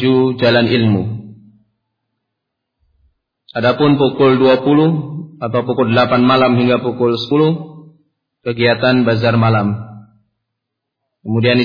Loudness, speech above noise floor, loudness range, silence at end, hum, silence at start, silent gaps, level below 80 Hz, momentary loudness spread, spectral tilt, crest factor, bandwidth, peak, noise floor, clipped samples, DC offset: -14 LUFS; 65 dB; 6 LU; 0 s; none; 0 s; none; -54 dBFS; 14 LU; -8.5 dB/octave; 14 dB; 5.2 kHz; -2 dBFS; -77 dBFS; under 0.1%; under 0.1%